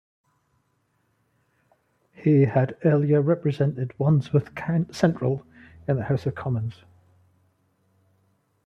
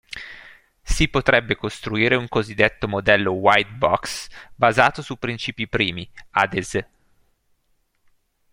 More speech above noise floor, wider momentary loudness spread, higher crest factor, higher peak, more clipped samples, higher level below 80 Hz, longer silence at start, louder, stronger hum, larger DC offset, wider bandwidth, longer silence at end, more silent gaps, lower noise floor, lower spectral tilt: about the same, 48 dB vs 46 dB; second, 8 LU vs 13 LU; about the same, 20 dB vs 22 dB; second, -6 dBFS vs 0 dBFS; neither; second, -60 dBFS vs -38 dBFS; first, 2.2 s vs 0.1 s; second, -24 LUFS vs -20 LUFS; neither; neither; second, 8 kHz vs 16.5 kHz; first, 1.95 s vs 1.7 s; neither; first, -70 dBFS vs -66 dBFS; first, -9 dB/octave vs -4.5 dB/octave